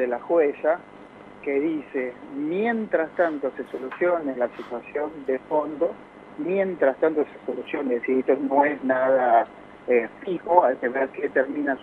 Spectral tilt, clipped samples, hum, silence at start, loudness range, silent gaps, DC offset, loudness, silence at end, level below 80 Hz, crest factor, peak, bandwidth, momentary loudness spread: -8 dB/octave; under 0.1%; none; 0 s; 5 LU; none; under 0.1%; -24 LUFS; 0 s; -66 dBFS; 22 dB; -2 dBFS; 4.4 kHz; 11 LU